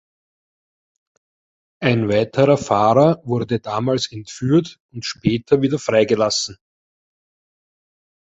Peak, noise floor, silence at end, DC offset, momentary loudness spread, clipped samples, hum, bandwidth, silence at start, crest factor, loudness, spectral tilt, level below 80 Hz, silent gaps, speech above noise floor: -2 dBFS; under -90 dBFS; 1.75 s; under 0.1%; 11 LU; under 0.1%; none; 8.2 kHz; 1.8 s; 18 dB; -18 LUFS; -5.5 dB/octave; -52 dBFS; 4.80-4.89 s; over 72 dB